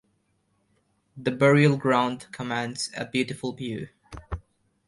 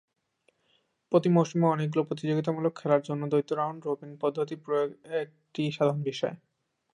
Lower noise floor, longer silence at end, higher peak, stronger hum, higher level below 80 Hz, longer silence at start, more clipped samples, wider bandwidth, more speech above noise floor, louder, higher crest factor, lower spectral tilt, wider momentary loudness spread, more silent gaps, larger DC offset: about the same, -70 dBFS vs -72 dBFS; about the same, 0.5 s vs 0.55 s; about the same, -8 dBFS vs -10 dBFS; neither; first, -50 dBFS vs -78 dBFS; about the same, 1.15 s vs 1.1 s; neither; about the same, 11.5 kHz vs 10.5 kHz; about the same, 46 dB vs 44 dB; first, -25 LUFS vs -29 LUFS; about the same, 20 dB vs 20 dB; second, -6 dB/octave vs -7.5 dB/octave; first, 19 LU vs 10 LU; neither; neither